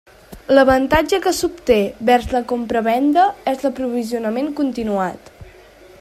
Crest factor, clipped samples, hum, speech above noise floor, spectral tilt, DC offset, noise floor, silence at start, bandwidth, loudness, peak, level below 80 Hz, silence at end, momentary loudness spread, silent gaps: 16 dB; under 0.1%; none; 27 dB; -4.5 dB/octave; under 0.1%; -44 dBFS; 0.3 s; 15.5 kHz; -18 LUFS; -2 dBFS; -40 dBFS; 0.5 s; 8 LU; none